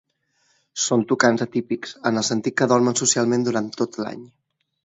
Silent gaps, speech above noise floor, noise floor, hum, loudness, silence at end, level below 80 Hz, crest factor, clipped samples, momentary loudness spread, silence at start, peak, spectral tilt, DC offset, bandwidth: none; 46 dB; -67 dBFS; none; -21 LUFS; 0.6 s; -66 dBFS; 20 dB; under 0.1%; 12 LU; 0.75 s; -2 dBFS; -3.5 dB/octave; under 0.1%; 8.2 kHz